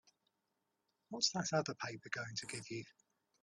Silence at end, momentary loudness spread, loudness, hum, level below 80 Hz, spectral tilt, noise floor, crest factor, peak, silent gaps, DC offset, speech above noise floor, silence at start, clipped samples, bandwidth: 0.5 s; 13 LU; -40 LUFS; none; -80 dBFS; -3 dB/octave; -86 dBFS; 24 dB; -20 dBFS; none; under 0.1%; 45 dB; 1.1 s; under 0.1%; 11.5 kHz